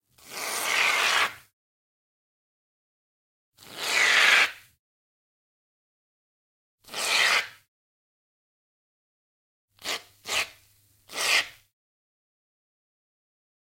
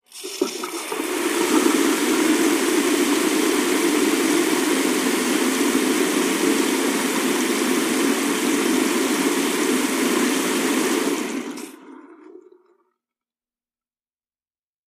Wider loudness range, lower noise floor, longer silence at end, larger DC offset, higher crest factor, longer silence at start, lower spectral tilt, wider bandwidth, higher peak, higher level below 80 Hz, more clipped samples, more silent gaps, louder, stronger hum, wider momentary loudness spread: about the same, 7 LU vs 6 LU; second, -62 dBFS vs under -90 dBFS; second, 2.2 s vs 2.5 s; neither; first, 24 dB vs 16 dB; about the same, 0.25 s vs 0.15 s; second, 1.5 dB/octave vs -2 dB/octave; about the same, 16.5 kHz vs 15.5 kHz; about the same, -6 dBFS vs -4 dBFS; second, -74 dBFS vs -68 dBFS; neither; first, 1.53-3.52 s, 4.79-6.78 s, 7.68-9.68 s vs none; second, -23 LUFS vs -20 LUFS; neither; first, 19 LU vs 7 LU